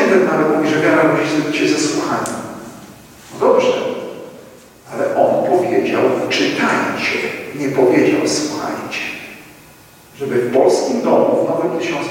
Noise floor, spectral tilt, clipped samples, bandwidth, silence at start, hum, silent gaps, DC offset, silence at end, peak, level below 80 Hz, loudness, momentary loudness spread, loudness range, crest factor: -43 dBFS; -4.5 dB/octave; under 0.1%; 17 kHz; 0 s; none; none; under 0.1%; 0 s; 0 dBFS; -58 dBFS; -16 LUFS; 15 LU; 3 LU; 16 dB